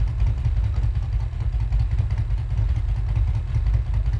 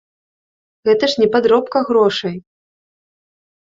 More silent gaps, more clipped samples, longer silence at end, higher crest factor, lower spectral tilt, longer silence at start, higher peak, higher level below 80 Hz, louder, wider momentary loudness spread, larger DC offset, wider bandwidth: neither; neither; second, 0 s vs 1.2 s; about the same, 12 dB vs 16 dB; first, -8 dB/octave vs -5 dB/octave; second, 0 s vs 0.85 s; second, -10 dBFS vs -2 dBFS; first, -24 dBFS vs -60 dBFS; second, -25 LUFS vs -15 LUFS; second, 3 LU vs 10 LU; neither; second, 5.8 kHz vs 7.6 kHz